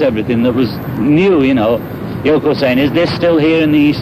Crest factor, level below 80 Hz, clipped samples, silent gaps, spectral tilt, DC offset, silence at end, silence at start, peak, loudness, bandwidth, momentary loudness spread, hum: 10 dB; -40 dBFS; under 0.1%; none; -8 dB/octave; under 0.1%; 0 s; 0 s; -2 dBFS; -12 LUFS; 14 kHz; 7 LU; none